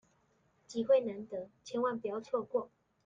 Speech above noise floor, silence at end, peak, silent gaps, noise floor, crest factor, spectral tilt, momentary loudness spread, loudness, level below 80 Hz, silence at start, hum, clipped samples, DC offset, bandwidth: 38 dB; 0.4 s; -18 dBFS; none; -73 dBFS; 18 dB; -5.5 dB/octave; 14 LU; -35 LUFS; -78 dBFS; 0.7 s; none; under 0.1%; under 0.1%; 7.6 kHz